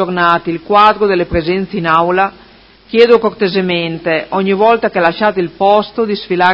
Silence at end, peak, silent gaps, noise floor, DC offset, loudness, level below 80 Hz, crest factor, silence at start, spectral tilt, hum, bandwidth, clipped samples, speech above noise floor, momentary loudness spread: 0 s; 0 dBFS; none; -42 dBFS; under 0.1%; -12 LUFS; -40 dBFS; 12 dB; 0 s; -7.5 dB/octave; none; 8 kHz; 0.3%; 30 dB; 7 LU